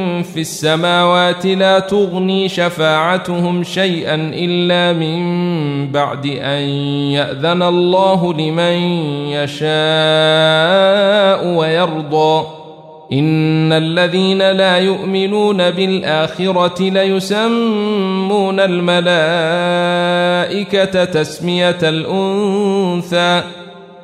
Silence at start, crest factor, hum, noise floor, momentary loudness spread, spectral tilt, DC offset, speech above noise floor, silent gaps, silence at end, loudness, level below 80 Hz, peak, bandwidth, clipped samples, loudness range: 0 s; 12 dB; none; -35 dBFS; 6 LU; -5.5 dB/octave; under 0.1%; 22 dB; none; 0 s; -14 LUFS; -58 dBFS; -2 dBFS; 14 kHz; under 0.1%; 3 LU